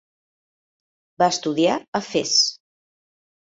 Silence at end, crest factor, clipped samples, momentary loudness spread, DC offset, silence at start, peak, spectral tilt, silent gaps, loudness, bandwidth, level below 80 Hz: 0.95 s; 20 dB; under 0.1%; 7 LU; under 0.1%; 1.2 s; -4 dBFS; -2.5 dB/octave; 1.88-1.93 s; -20 LUFS; 8 kHz; -68 dBFS